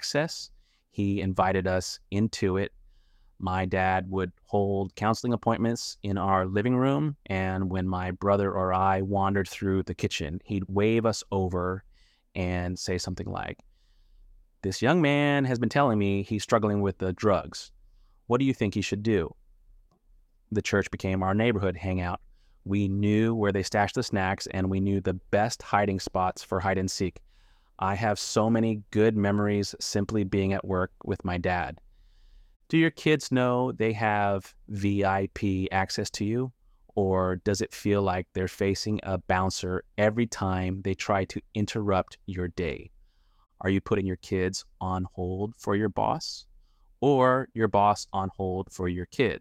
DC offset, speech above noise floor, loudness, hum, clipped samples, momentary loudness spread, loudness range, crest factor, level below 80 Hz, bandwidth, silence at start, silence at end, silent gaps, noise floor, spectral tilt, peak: under 0.1%; 34 dB; -28 LUFS; none; under 0.1%; 9 LU; 4 LU; 20 dB; -54 dBFS; 14.5 kHz; 0 s; 0 s; 32.56-32.60 s; -61 dBFS; -6 dB/octave; -8 dBFS